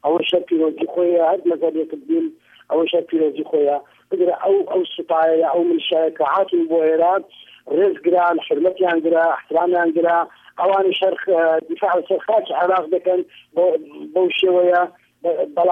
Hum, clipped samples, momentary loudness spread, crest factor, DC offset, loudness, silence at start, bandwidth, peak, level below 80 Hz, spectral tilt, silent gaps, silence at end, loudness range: none; under 0.1%; 6 LU; 12 dB; under 0.1%; -18 LUFS; 0.05 s; 3.8 kHz; -6 dBFS; -70 dBFS; -6.5 dB/octave; none; 0 s; 2 LU